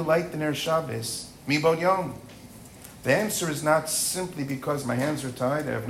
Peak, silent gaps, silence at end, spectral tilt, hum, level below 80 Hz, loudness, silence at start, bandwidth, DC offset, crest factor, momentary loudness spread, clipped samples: -8 dBFS; none; 0 s; -4 dB/octave; none; -58 dBFS; -26 LUFS; 0 s; 16 kHz; under 0.1%; 18 dB; 17 LU; under 0.1%